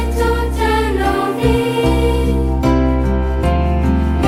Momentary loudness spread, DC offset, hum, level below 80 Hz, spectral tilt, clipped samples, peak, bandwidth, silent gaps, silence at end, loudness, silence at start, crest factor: 2 LU; under 0.1%; none; -18 dBFS; -7 dB/octave; under 0.1%; -2 dBFS; 15.5 kHz; none; 0 s; -16 LUFS; 0 s; 14 dB